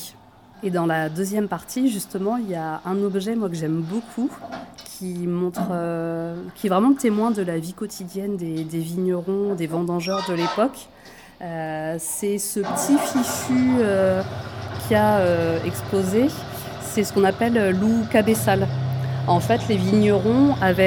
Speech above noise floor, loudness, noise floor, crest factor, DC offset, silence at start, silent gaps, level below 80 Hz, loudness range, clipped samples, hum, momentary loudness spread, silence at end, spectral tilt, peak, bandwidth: 27 dB; -22 LUFS; -48 dBFS; 18 dB; under 0.1%; 0 s; none; -54 dBFS; 6 LU; under 0.1%; none; 13 LU; 0 s; -6 dB/octave; -4 dBFS; over 20 kHz